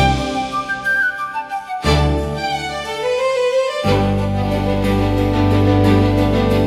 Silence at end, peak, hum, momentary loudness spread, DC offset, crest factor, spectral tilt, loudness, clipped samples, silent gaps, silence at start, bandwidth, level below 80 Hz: 0 s; -2 dBFS; none; 8 LU; under 0.1%; 14 dB; -6.5 dB/octave; -17 LUFS; under 0.1%; none; 0 s; 13.5 kHz; -28 dBFS